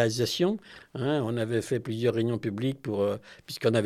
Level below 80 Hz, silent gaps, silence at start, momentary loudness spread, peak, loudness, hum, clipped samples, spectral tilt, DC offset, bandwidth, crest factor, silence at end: -68 dBFS; none; 0 s; 9 LU; -8 dBFS; -29 LUFS; none; under 0.1%; -6 dB/octave; under 0.1%; 14.5 kHz; 20 dB; 0 s